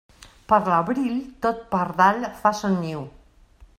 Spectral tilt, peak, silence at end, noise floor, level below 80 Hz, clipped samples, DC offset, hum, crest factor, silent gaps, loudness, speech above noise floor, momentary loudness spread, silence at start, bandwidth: -6.5 dB/octave; -4 dBFS; 0.15 s; -52 dBFS; -54 dBFS; under 0.1%; under 0.1%; none; 20 dB; none; -22 LUFS; 30 dB; 9 LU; 0.2 s; 15 kHz